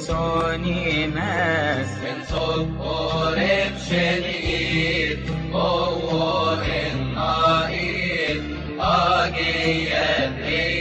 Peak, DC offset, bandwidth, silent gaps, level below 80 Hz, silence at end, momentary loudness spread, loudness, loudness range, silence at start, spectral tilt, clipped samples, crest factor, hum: -8 dBFS; under 0.1%; 9.4 kHz; none; -36 dBFS; 0 s; 6 LU; -22 LUFS; 2 LU; 0 s; -5.5 dB/octave; under 0.1%; 14 dB; none